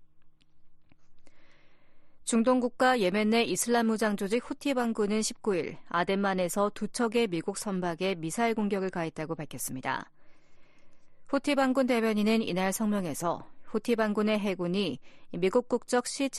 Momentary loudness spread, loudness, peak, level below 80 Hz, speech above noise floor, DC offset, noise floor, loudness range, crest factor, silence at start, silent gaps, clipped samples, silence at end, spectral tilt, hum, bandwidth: 9 LU; -29 LUFS; -12 dBFS; -62 dBFS; 24 dB; under 0.1%; -53 dBFS; 5 LU; 16 dB; 0 s; none; under 0.1%; 0 s; -4.5 dB/octave; none; 12.5 kHz